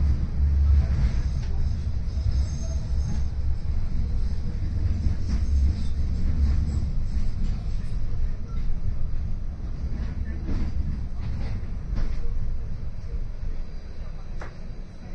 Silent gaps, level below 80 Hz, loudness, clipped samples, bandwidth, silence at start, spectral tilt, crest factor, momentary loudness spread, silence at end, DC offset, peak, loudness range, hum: none; -26 dBFS; -29 LUFS; under 0.1%; 6.8 kHz; 0 s; -7.5 dB/octave; 14 dB; 12 LU; 0 s; under 0.1%; -10 dBFS; 7 LU; none